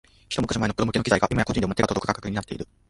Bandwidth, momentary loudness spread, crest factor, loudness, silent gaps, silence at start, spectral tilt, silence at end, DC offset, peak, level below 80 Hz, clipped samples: 11.5 kHz; 9 LU; 22 dB; -25 LUFS; none; 0.3 s; -5.5 dB/octave; 0.25 s; under 0.1%; -4 dBFS; -44 dBFS; under 0.1%